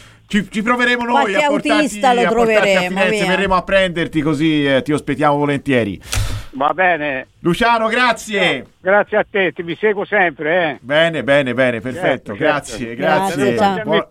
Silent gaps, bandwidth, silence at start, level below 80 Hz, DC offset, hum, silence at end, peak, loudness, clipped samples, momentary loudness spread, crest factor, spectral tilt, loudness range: none; 16.5 kHz; 0.3 s; -38 dBFS; under 0.1%; none; 0.05 s; 0 dBFS; -16 LUFS; under 0.1%; 6 LU; 14 dB; -5 dB/octave; 2 LU